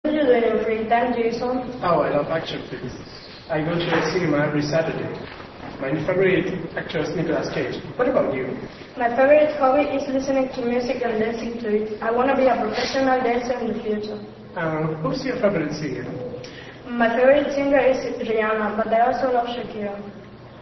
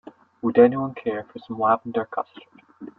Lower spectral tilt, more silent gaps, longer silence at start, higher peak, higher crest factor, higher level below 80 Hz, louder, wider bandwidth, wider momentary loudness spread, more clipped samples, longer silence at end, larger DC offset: second, -6 dB/octave vs -10 dB/octave; neither; second, 0.05 s vs 0.45 s; about the same, -4 dBFS vs -2 dBFS; about the same, 18 dB vs 22 dB; first, -50 dBFS vs -66 dBFS; about the same, -22 LUFS vs -22 LUFS; first, 6.2 kHz vs 4.3 kHz; second, 15 LU vs 18 LU; neither; about the same, 0 s vs 0.1 s; neither